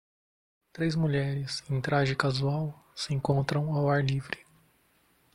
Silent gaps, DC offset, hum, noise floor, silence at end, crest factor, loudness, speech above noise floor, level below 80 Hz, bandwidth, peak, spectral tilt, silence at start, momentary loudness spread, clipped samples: none; under 0.1%; none; -67 dBFS; 0.95 s; 20 dB; -29 LUFS; 39 dB; -58 dBFS; 11.5 kHz; -10 dBFS; -6.5 dB/octave; 0.75 s; 8 LU; under 0.1%